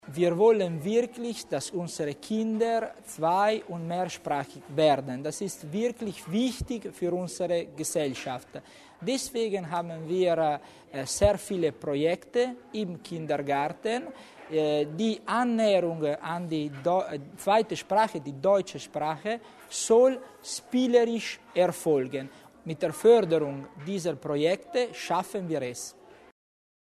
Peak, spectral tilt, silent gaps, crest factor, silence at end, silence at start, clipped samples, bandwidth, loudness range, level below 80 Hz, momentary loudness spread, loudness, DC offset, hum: -8 dBFS; -5 dB/octave; none; 20 dB; 0.95 s; 0.05 s; under 0.1%; 13.5 kHz; 5 LU; -56 dBFS; 12 LU; -28 LUFS; under 0.1%; none